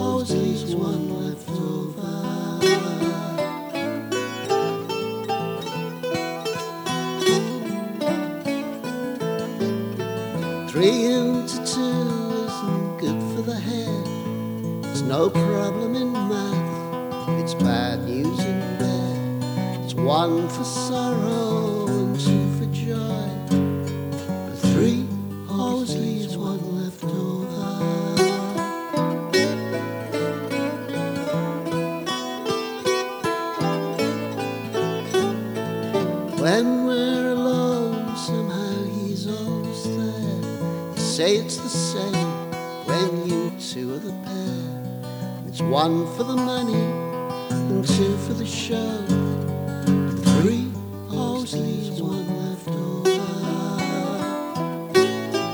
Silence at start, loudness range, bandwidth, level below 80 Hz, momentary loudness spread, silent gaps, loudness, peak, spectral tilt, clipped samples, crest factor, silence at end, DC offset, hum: 0 s; 3 LU; over 20 kHz; -62 dBFS; 8 LU; none; -24 LUFS; -4 dBFS; -5.5 dB/octave; under 0.1%; 18 dB; 0 s; under 0.1%; none